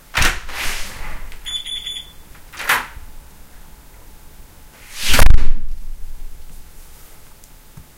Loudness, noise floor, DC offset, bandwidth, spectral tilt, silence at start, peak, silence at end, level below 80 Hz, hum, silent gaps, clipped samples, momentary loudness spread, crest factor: -21 LUFS; -42 dBFS; under 0.1%; 16 kHz; -2.5 dB/octave; 0.15 s; 0 dBFS; 1.35 s; -20 dBFS; none; none; 0.4%; 26 LU; 14 dB